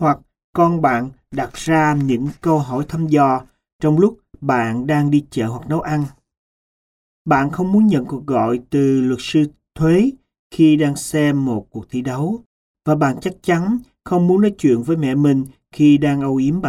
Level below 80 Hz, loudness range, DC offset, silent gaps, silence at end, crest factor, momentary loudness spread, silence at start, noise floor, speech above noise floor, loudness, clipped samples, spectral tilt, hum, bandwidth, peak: -48 dBFS; 3 LU; under 0.1%; 0.44-0.53 s, 3.73-3.79 s, 6.38-7.25 s, 10.39-10.50 s, 12.46-12.75 s; 0 s; 16 dB; 10 LU; 0 s; under -90 dBFS; over 74 dB; -18 LUFS; under 0.1%; -7 dB/octave; none; 14.5 kHz; -2 dBFS